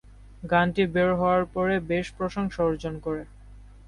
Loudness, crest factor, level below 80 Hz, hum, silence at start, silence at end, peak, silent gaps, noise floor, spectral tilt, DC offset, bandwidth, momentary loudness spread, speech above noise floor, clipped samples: -26 LUFS; 18 dB; -46 dBFS; none; 0.1 s; 0.1 s; -8 dBFS; none; -47 dBFS; -7 dB/octave; under 0.1%; 11 kHz; 10 LU; 22 dB; under 0.1%